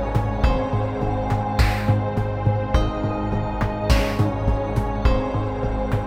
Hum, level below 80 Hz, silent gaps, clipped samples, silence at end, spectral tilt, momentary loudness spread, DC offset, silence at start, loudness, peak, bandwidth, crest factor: none; -26 dBFS; none; under 0.1%; 0 s; -7 dB/octave; 4 LU; under 0.1%; 0 s; -23 LUFS; -4 dBFS; 15.5 kHz; 18 dB